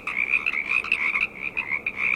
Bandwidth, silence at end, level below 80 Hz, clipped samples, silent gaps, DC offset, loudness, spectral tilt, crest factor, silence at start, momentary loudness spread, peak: 15.5 kHz; 0 s; -56 dBFS; under 0.1%; none; under 0.1%; -23 LUFS; -2.5 dB/octave; 18 dB; 0 s; 5 LU; -8 dBFS